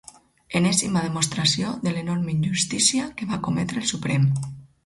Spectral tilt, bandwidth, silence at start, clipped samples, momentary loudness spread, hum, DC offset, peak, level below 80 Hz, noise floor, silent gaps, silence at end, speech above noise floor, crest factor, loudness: -4 dB/octave; 11.5 kHz; 0.5 s; under 0.1%; 8 LU; none; under 0.1%; -4 dBFS; -54 dBFS; -46 dBFS; none; 0.2 s; 23 dB; 20 dB; -23 LUFS